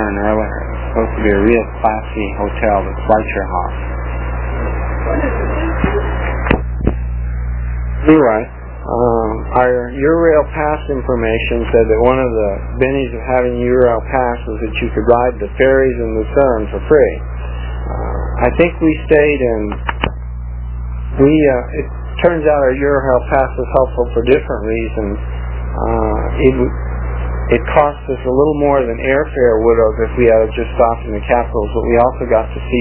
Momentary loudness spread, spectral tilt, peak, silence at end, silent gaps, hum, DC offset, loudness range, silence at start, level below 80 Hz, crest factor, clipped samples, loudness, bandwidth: 10 LU; -11 dB/octave; 0 dBFS; 0 s; none; 60 Hz at -20 dBFS; under 0.1%; 4 LU; 0 s; -22 dBFS; 14 dB; under 0.1%; -15 LUFS; 4 kHz